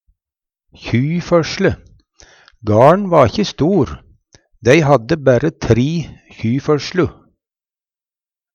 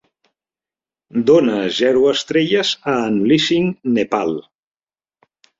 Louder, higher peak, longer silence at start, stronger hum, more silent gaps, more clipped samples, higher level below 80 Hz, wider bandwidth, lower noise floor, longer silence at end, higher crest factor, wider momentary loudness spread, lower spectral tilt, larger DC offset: about the same, -15 LUFS vs -16 LUFS; about the same, 0 dBFS vs -2 dBFS; second, 0.8 s vs 1.15 s; neither; neither; neither; first, -42 dBFS vs -58 dBFS; first, 9.2 kHz vs 7.8 kHz; about the same, under -90 dBFS vs under -90 dBFS; first, 1.45 s vs 1.2 s; about the same, 16 dB vs 16 dB; first, 12 LU vs 6 LU; first, -6.5 dB/octave vs -5 dB/octave; neither